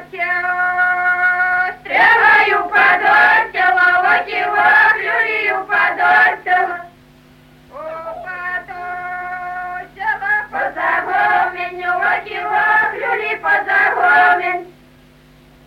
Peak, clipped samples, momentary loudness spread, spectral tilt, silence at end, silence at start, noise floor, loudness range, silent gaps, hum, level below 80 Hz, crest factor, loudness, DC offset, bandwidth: -2 dBFS; under 0.1%; 15 LU; -4 dB/octave; 0.95 s; 0 s; -46 dBFS; 11 LU; none; none; -54 dBFS; 14 dB; -14 LUFS; under 0.1%; 15 kHz